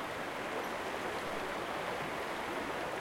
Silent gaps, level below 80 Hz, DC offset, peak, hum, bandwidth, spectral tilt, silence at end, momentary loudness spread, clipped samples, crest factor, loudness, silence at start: none; -64 dBFS; under 0.1%; -24 dBFS; none; 16.5 kHz; -3.5 dB/octave; 0 s; 1 LU; under 0.1%; 14 dB; -38 LUFS; 0 s